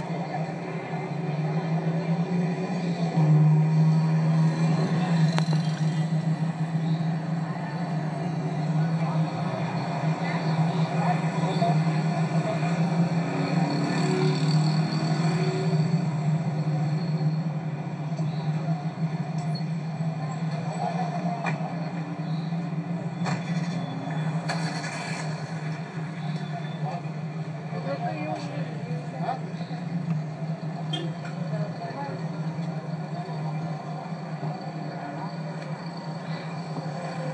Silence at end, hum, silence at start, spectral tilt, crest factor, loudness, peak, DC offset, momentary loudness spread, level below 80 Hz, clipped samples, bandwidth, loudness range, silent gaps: 0 s; none; 0 s; -7.5 dB/octave; 22 dB; -28 LUFS; -4 dBFS; under 0.1%; 10 LU; -76 dBFS; under 0.1%; 9.4 kHz; 9 LU; none